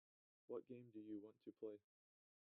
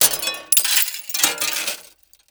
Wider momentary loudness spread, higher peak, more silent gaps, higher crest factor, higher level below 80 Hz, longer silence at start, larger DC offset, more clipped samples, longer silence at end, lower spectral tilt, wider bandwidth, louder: second, 6 LU vs 10 LU; second, -40 dBFS vs 0 dBFS; neither; about the same, 18 dB vs 20 dB; second, under -90 dBFS vs -62 dBFS; first, 0.5 s vs 0 s; neither; neither; first, 0.8 s vs 0.45 s; first, -7.5 dB/octave vs 2 dB/octave; second, 3.9 kHz vs over 20 kHz; second, -57 LUFS vs -18 LUFS